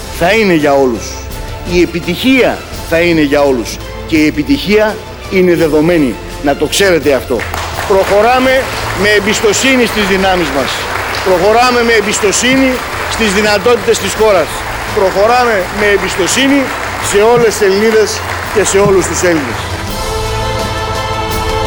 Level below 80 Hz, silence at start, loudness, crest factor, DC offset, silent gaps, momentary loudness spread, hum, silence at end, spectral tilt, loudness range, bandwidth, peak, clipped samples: -28 dBFS; 0 s; -11 LUFS; 10 dB; under 0.1%; none; 8 LU; none; 0 s; -4 dB/octave; 2 LU; over 20 kHz; 0 dBFS; under 0.1%